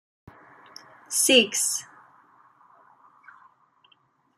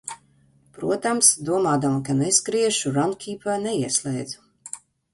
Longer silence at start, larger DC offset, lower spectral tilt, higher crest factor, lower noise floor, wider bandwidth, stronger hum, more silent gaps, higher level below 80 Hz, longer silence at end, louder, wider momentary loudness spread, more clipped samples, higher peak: first, 1.1 s vs 0.05 s; neither; second, 0 dB/octave vs -3.5 dB/octave; about the same, 26 dB vs 22 dB; first, -65 dBFS vs -59 dBFS; first, 15 kHz vs 12 kHz; neither; neither; second, -76 dBFS vs -62 dBFS; first, 2.55 s vs 0.35 s; about the same, -21 LUFS vs -21 LUFS; second, 11 LU vs 21 LU; neither; about the same, -4 dBFS vs -2 dBFS